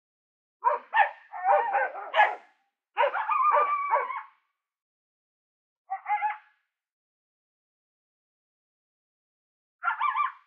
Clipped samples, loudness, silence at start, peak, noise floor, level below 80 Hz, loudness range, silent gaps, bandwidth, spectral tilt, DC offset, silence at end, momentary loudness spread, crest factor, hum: under 0.1%; -26 LUFS; 0.65 s; -8 dBFS; -73 dBFS; under -90 dBFS; 12 LU; 4.82-5.85 s, 6.93-9.79 s; 6.8 kHz; 6.5 dB/octave; under 0.1%; 0.1 s; 14 LU; 24 dB; none